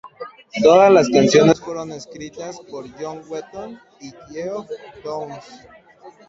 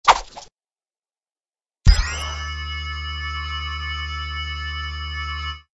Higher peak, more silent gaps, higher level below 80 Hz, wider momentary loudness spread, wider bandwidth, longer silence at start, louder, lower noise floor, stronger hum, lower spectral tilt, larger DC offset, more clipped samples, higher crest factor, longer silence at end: about the same, 0 dBFS vs 0 dBFS; neither; second, -58 dBFS vs -26 dBFS; first, 23 LU vs 9 LU; second, 7.8 kHz vs 11 kHz; about the same, 0.05 s vs 0.05 s; first, -15 LUFS vs -25 LUFS; second, -45 dBFS vs under -90 dBFS; neither; first, -5 dB/octave vs -3.5 dB/octave; neither; neither; second, 18 dB vs 24 dB; about the same, 0.2 s vs 0.15 s